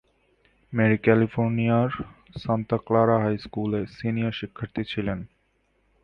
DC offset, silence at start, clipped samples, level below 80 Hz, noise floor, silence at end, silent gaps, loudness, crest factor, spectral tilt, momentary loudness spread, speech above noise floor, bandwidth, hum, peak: under 0.1%; 0.7 s; under 0.1%; -52 dBFS; -68 dBFS; 0.8 s; none; -25 LUFS; 20 dB; -9.5 dB/octave; 13 LU; 44 dB; 5.8 kHz; none; -4 dBFS